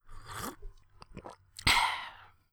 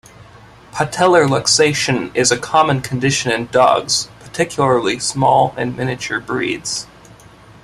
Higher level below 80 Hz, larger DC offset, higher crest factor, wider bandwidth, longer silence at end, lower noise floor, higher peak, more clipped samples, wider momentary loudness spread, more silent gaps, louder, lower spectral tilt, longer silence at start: about the same, -48 dBFS vs -48 dBFS; neither; first, 24 dB vs 16 dB; first, over 20 kHz vs 14 kHz; second, 0.25 s vs 0.5 s; first, -54 dBFS vs -42 dBFS; second, -10 dBFS vs 0 dBFS; neither; first, 24 LU vs 10 LU; neither; second, -30 LUFS vs -16 LUFS; second, -1.5 dB/octave vs -3.5 dB/octave; second, 0.05 s vs 0.2 s